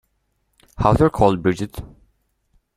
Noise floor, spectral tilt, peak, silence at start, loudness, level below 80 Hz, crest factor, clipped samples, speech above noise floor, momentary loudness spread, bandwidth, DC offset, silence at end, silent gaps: -69 dBFS; -7.5 dB/octave; -2 dBFS; 0.8 s; -18 LUFS; -38 dBFS; 20 dB; under 0.1%; 52 dB; 14 LU; 15 kHz; under 0.1%; 0.9 s; none